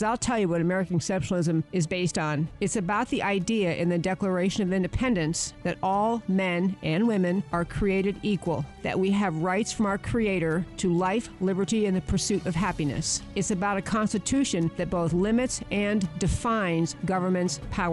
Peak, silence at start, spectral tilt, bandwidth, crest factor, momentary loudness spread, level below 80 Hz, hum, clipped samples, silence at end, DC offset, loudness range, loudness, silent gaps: -14 dBFS; 0 s; -5.5 dB/octave; 11.5 kHz; 12 dB; 3 LU; -44 dBFS; none; under 0.1%; 0 s; under 0.1%; 1 LU; -27 LUFS; none